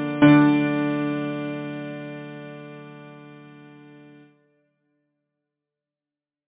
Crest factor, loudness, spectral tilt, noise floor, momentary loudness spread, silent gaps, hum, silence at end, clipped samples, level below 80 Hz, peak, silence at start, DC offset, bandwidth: 22 dB; -21 LUFS; -6 dB/octave; under -90 dBFS; 27 LU; none; none; 2.95 s; under 0.1%; -64 dBFS; -2 dBFS; 0 s; under 0.1%; 3.9 kHz